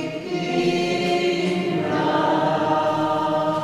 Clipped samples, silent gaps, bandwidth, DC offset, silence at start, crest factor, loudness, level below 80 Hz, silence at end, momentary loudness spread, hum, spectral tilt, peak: under 0.1%; none; 13 kHz; under 0.1%; 0 s; 12 dB; -21 LUFS; -58 dBFS; 0 s; 3 LU; none; -6 dB/octave; -8 dBFS